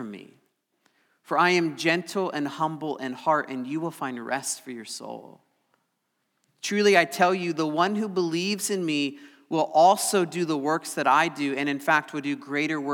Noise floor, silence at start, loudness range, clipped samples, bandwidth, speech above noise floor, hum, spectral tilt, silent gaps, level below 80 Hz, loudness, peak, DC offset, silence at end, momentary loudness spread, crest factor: -76 dBFS; 0 s; 7 LU; under 0.1%; 19.5 kHz; 51 dB; none; -4 dB/octave; none; under -90 dBFS; -25 LUFS; -4 dBFS; under 0.1%; 0 s; 13 LU; 22 dB